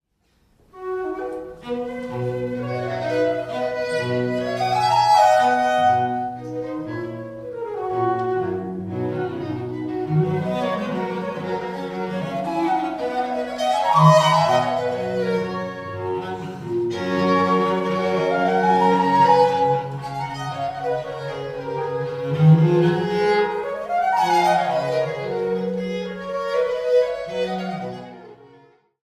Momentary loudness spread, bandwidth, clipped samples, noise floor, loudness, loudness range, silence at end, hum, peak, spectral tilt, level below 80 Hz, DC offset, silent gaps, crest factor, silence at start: 14 LU; 14.5 kHz; under 0.1%; -64 dBFS; -21 LUFS; 6 LU; 0.55 s; none; -2 dBFS; -6.5 dB/octave; -58 dBFS; under 0.1%; none; 20 dB; 0.75 s